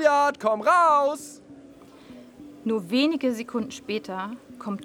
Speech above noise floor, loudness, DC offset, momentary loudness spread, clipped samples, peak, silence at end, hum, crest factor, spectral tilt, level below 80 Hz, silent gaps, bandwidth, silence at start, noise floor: 24 dB; -24 LUFS; under 0.1%; 17 LU; under 0.1%; -8 dBFS; 0 s; none; 18 dB; -4.5 dB/octave; -68 dBFS; none; 20 kHz; 0 s; -48 dBFS